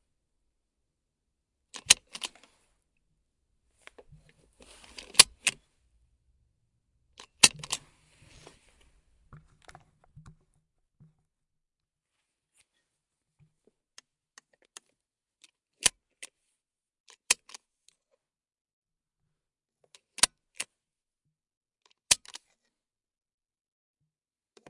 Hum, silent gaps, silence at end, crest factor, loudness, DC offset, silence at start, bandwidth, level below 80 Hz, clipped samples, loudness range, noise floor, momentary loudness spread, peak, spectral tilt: none; 17.00-17.04 s, 18.61-18.65 s, 18.73-18.82 s, 21.57-21.61 s; 2.55 s; 36 dB; -24 LUFS; under 0.1%; 1.9 s; 12 kHz; -66 dBFS; under 0.1%; 9 LU; under -90 dBFS; 28 LU; 0 dBFS; 1.5 dB/octave